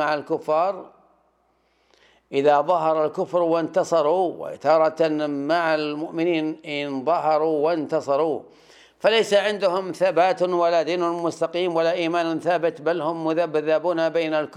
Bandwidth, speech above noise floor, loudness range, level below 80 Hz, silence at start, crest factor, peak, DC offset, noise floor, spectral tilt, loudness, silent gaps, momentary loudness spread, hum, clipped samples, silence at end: 12 kHz; 44 dB; 2 LU; -76 dBFS; 0 s; 18 dB; -6 dBFS; under 0.1%; -65 dBFS; -5 dB/octave; -22 LUFS; none; 6 LU; none; under 0.1%; 0 s